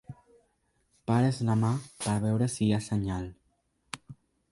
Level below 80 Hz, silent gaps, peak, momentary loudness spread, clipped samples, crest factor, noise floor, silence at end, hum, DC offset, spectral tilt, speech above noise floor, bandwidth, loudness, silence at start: -54 dBFS; none; -12 dBFS; 17 LU; under 0.1%; 18 dB; -73 dBFS; 0.4 s; none; under 0.1%; -6.5 dB/octave; 45 dB; 11.5 kHz; -29 LUFS; 0.1 s